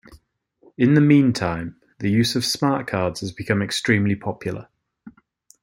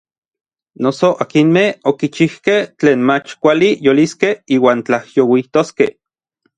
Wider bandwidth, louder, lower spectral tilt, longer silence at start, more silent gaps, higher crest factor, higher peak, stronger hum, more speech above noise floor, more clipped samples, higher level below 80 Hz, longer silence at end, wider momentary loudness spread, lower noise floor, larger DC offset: first, 16.5 kHz vs 9.4 kHz; second, -21 LUFS vs -14 LUFS; about the same, -5.5 dB/octave vs -6 dB/octave; second, 0.1 s vs 0.8 s; neither; about the same, 18 dB vs 14 dB; second, -4 dBFS vs 0 dBFS; neither; second, 40 dB vs 52 dB; neither; about the same, -56 dBFS vs -60 dBFS; second, 0.55 s vs 0.7 s; first, 15 LU vs 5 LU; second, -60 dBFS vs -66 dBFS; neither